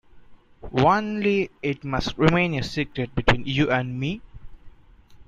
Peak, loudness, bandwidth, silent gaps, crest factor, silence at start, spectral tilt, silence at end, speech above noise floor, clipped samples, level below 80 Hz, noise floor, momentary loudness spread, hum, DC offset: -2 dBFS; -23 LUFS; 9.6 kHz; none; 22 dB; 0.15 s; -6.5 dB/octave; 0.05 s; 27 dB; under 0.1%; -40 dBFS; -50 dBFS; 9 LU; none; under 0.1%